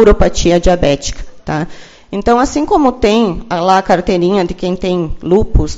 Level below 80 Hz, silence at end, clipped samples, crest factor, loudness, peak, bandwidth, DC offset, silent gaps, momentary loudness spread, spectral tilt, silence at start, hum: -22 dBFS; 0 s; 0.3%; 12 dB; -13 LUFS; 0 dBFS; 8 kHz; under 0.1%; none; 9 LU; -5.5 dB/octave; 0 s; none